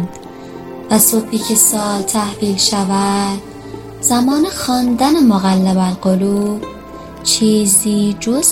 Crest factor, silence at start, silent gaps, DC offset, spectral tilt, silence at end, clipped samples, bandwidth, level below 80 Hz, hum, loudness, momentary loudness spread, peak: 14 dB; 0 s; none; under 0.1%; -4 dB/octave; 0 s; under 0.1%; 16.5 kHz; -44 dBFS; none; -13 LUFS; 20 LU; 0 dBFS